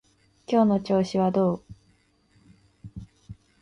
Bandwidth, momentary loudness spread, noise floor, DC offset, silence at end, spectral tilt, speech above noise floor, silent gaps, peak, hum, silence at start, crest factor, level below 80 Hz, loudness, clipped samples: 10.5 kHz; 23 LU; -64 dBFS; under 0.1%; 0.3 s; -8 dB/octave; 42 dB; none; -8 dBFS; none; 0.5 s; 18 dB; -56 dBFS; -24 LUFS; under 0.1%